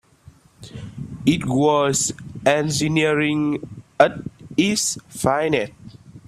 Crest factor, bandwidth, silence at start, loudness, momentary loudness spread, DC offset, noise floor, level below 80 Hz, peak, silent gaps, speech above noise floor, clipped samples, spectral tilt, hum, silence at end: 20 dB; 15 kHz; 0.6 s; -20 LUFS; 16 LU; under 0.1%; -50 dBFS; -52 dBFS; 0 dBFS; none; 31 dB; under 0.1%; -4 dB/octave; none; 0.1 s